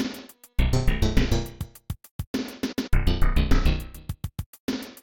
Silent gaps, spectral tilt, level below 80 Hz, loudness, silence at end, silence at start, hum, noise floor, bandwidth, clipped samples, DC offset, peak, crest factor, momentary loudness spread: 2.11-2.19 s, 2.27-2.34 s, 4.46-4.53 s, 4.59-4.68 s; -6 dB/octave; -26 dBFS; -28 LUFS; 0.1 s; 0 s; none; -42 dBFS; 18 kHz; under 0.1%; under 0.1%; -6 dBFS; 18 dB; 13 LU